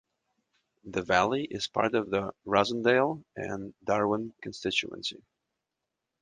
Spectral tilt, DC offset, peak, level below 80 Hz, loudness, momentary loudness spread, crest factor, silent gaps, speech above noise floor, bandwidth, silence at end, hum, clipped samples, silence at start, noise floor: -4.5 dB/octave; under 0.1%; -8 dBFS; -62 dBFS; -29 LUFS; 12 LU; 22 dB; none; 57 dB; 9.8 kHz; 1.1 s; none; under 0.1%; 0.85 s; -86 dBFS